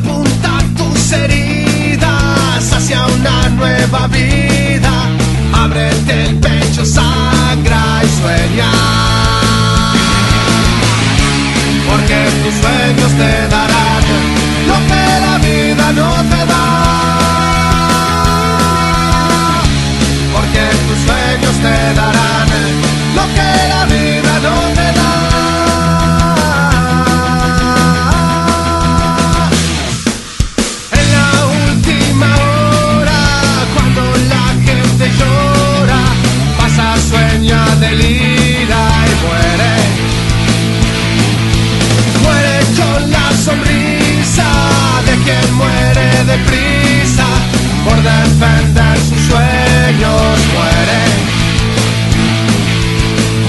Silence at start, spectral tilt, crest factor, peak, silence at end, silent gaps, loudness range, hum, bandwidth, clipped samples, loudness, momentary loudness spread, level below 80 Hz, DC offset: 0 s; -5 dB/octave; 10 dB; 0 dBFS; 0 s; none; 1 LU; none; 12.5 kHz; under 0.1%; -10 LUFS; 2 LU; -18 dBFS; under 0.1%